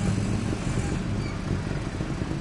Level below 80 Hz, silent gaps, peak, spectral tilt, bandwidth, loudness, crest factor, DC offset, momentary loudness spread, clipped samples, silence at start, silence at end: -36 dBFS; none; -14 dBFS; -6.5 dB/octave; 11.5 kHz; -29 LUFS; 14 dB; under 0.1%; 4 LU; under 0.1%; 0 s; 0 s